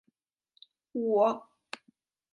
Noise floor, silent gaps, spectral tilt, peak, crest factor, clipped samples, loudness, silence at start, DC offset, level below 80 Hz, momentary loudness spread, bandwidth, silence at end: -77 dBFS; none; -6 dB/octave; -14 dBFS; 20 dB; under 0.1%; -29 LUFS; 0.95 s; under 0.1%; -88 dBFS; 20 LU; 11 kHz; 0.95 s